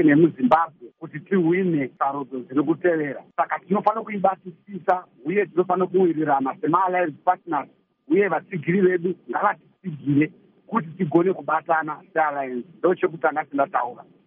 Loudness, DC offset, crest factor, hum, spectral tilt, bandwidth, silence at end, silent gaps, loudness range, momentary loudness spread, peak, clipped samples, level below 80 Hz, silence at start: -23 LUFS; under 0.1%; 18 dB; none; -6.5 dB/octave; 4.1 kHz; 0.25 s; none; 2 LU; 9 LU; -4 dBFS; under 0.1%; -70 dBFS; 0 s